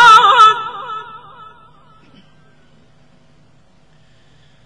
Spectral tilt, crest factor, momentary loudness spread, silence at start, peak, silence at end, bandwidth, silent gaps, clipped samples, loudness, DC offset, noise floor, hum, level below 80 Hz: -0.5 dB/octave; 16 dB; 23 LU; 0 s; 0 dBFS; 3.65 s; 11.5 kHz; none; 0.1%; -9 LUFS; 0.3%; -52 dBFS; none; -58 dBFS